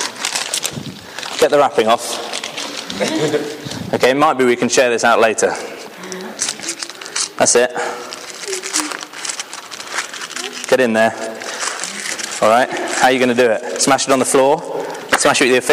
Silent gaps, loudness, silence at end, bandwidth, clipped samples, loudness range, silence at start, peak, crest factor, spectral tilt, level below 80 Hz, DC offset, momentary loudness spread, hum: none; -16 LUFS; 0 s; 16 kHz; under 0.1%; 5 LU; 0 s; -2 dBFS; 16 dB; -2.5 dB/octave; -58 dBFS; under 0.1%; 13 LU; none